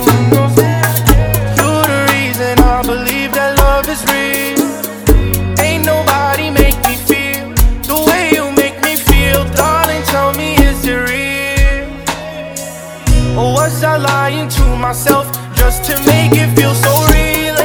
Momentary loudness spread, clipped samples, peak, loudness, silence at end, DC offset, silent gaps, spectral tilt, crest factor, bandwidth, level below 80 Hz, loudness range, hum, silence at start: 5 LU; 0.8%; 0 dBFS; -12 LUFS; 0 s; under 0.1%; none; -4.5 dB/octave; 12 dB; over 20 kHz; -18 dBFS; 3 LU; none; 0 s